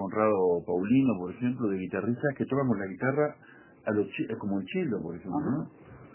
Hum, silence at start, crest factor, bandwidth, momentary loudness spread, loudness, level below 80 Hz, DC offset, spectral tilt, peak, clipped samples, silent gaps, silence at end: none; 0 s; 16 dB; 3.2 kHz; 8 LU; -29 LUFS; -62 dBFS; under 0.1%; -11.5 dB/octave; -12 dBFS; under 0.1%; none; 0.05 s